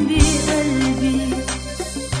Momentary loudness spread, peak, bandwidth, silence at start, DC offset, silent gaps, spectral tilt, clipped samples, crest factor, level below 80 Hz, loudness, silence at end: 10 LU; 0 dBFS; 11 kHz; 0 s; under 0.1%; none; -4.5 dB/octave; under 0.1%; 18 dB; -26 dBFS; -19 LUFS; 0 s